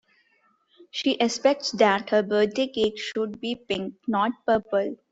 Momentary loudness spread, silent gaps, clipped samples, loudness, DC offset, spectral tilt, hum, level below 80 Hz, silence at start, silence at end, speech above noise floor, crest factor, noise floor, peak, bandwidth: 8 LU; none; under 0.1%; -25 LUFS; under 0.1%; -4 dB/octave; none; -64 dBFS; 0.8 s; 0.15 s; 41 dB; 20 dB; -66 dBFS; -6 dBFS; 8 kHz